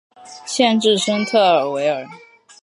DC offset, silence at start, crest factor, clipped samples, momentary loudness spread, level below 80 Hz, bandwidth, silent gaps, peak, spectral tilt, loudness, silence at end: under 0.1%; 0.25 s; 16 dB; under 0.1%; 13 LU; -74 dBFS; 11.5 kHz; none; -2 dBFS; -3.5 dB/octave; -17 LUFS; 0.45 s